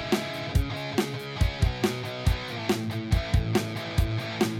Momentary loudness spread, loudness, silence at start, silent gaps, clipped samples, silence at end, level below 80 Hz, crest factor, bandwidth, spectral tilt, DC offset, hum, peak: 3 LU; -28 LUFS; 0 s; none; under 0.1%; 0 s; -32 dBFS; 16 dB; 16.5 kHz; -5.5 dB/octave; under 0.1%; none; -10 dBFS